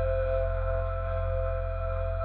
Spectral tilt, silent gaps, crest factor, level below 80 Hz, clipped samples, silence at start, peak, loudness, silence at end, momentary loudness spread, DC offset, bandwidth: -6.5 dB/octave; none; 12 dB; -32 dBFS; under 0.1%; 0 s; -18 dBFS; -31 LUFS; 0 s; 4 LU; under 0.1%; 4.3 kHz